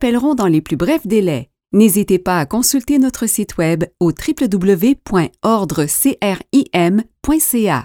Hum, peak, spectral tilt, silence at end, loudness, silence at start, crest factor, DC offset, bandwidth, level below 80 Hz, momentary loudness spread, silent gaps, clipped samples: none; 0 dBFS; -5 dB/octave; 0 s; -15 LUFS; 0 s; 14 dB; under 0.1%; 19 kHz; -40 dBFS; 5 LU; none; under 0.1%